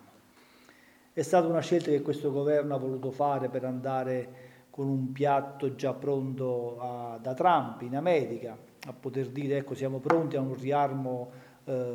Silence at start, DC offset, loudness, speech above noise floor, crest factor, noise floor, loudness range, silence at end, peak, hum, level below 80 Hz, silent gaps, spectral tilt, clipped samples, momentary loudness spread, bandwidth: 1.15 s; under 0.1%; -30 LUFS; 29 dB; 22 dB; -59 dBFS; 3 LU; 0 s; -8 dBFS; none; -78 dBFS; none; -7 dB/octave; under 0.1%; 11 LU; 19.5 kHz